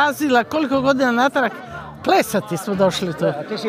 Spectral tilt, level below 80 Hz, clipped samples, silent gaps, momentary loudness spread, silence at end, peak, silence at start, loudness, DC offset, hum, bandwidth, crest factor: -5 dB/octave; -52 dBFS; under 0.1%; none; 8 LU; 0 s; -4 dBFS; 0 s; -19 LUFS; under 0.1%; none; 15.5 kHz; 16 dB